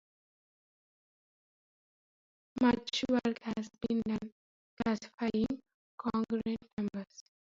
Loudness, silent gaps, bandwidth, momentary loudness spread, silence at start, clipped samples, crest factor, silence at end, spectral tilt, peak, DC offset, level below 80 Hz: -35 LUFS; 4.32-4.77 s, 5.14-5.18 s, 5.74-5.98 s, 6.73-6.77 s; 7.6 kHz; 12 LU; 2.55 s; under 0.1%; 22 dB; 0.35 s; -5.5 dB/octave; -14 dBFS; under 0.1%; -64 dBFS